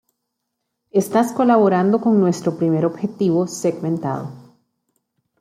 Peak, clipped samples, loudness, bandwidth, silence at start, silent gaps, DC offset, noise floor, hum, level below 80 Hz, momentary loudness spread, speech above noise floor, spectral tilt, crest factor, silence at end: -2 dBFS; under 0.1%; -18 LUFS; 15 kHz; 0.95 s; none; under 0.1%; -77 dBFS; none; -66 dBFS; 9 LU; 59 dB; -7 dB/octave; 16 dB; 1 s